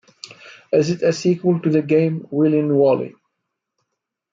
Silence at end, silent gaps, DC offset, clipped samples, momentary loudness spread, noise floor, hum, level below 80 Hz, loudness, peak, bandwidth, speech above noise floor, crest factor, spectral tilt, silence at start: 1.2 s; none; under 0.1%; under 0.1%; 17 LU; -78 dBFS; none; -66 dBFS; -18 LUFS; -6 dBFS; 7.6 kHz; 61 dB; 14 dB; -7 dB/octave; 0.25 s